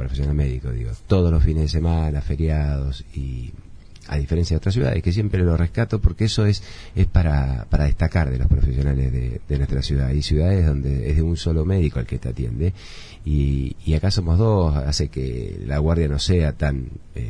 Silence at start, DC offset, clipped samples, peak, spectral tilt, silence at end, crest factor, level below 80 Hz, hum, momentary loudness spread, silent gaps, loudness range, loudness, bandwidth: 0 s; under 0.1%; under 0.1%; -2 dBFS; -7 dB/octave; 0 s; 18 dB; -24 dBFS; none; 9 LU; none; 2 LU; -22 LUFS; 10 kHz